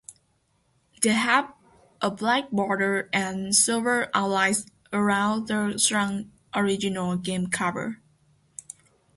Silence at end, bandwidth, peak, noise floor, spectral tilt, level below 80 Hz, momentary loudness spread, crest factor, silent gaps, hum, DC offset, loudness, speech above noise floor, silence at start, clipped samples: 1.2 s; 12 kHz; -6 dBFS; -68 dBFS; -3 dB/octave; -64 dBFS; 16 LU; 20 dB; none; none; under 0.1%; -24 LUFS; 44 dB; 0.1 s; under 0.1%